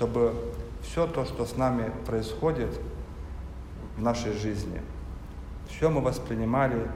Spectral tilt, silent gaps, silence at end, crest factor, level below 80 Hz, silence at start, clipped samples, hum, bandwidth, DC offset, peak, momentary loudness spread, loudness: -7 dB/octave; none; 0 s; 18 dB; -40 dBFS; 0 s; under 0.1%; none; 15.5 kHz; under 0.1%; -10 dBFS; 15 LU; -29 LUFS